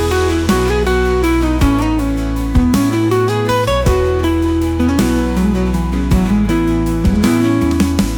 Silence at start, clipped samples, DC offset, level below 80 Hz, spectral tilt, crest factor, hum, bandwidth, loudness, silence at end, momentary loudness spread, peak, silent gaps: 0 s; under 0.1%; under 0.1%; -20 dBFS; -6.5 dB/octave; 12 dB; none; 19.5 kHz; -14 LUFS; 0 s; 3 LU; -2 dBFS; none